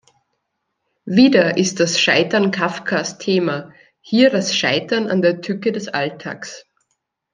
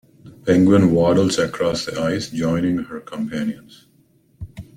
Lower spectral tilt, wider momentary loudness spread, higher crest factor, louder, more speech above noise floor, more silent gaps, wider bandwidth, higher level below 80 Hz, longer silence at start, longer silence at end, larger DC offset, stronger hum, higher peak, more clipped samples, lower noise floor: second, -4 dB/octave vs -6 dB/octave; second, 13 LU vs 19 LU; about the same, 18 dB vs 18 dB; about the same, -17 LUFS vs -19 LUFS; first, 57 dB vs 39 dB; neither; second, 9.8 kHz vs 15.5 kHz; second, -64 dBFS vs -48 dBFS; first, 1.05 s vs 0.25 s; first, 0.75 s vs 0.15 s; neither; neither; about the same, -2 dBFS vs -2 dBFS; neither; first, -74 dBFS vs -57 dBFS